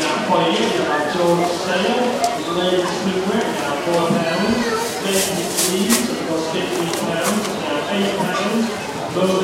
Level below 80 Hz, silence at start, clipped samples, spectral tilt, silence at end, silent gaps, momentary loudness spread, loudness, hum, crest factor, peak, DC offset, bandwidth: -54 dBFS; 0 s; under 0.1%; -3.5 dB/octave; 0 s; none; 4 LU; -19 LUFS; none; 18 dB; 0 dBFS; under 0.1%; 16 kHz